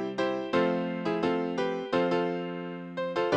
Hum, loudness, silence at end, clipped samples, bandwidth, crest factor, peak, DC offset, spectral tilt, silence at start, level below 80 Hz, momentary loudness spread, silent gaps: none; -30 LUFS; 0 s; under 0.1%; 8.8 kHz; 16 dB; -12 dBFS; under 0.1%; -6.5 dB/octave; 0 s; -70 dBFS; 8 LU; none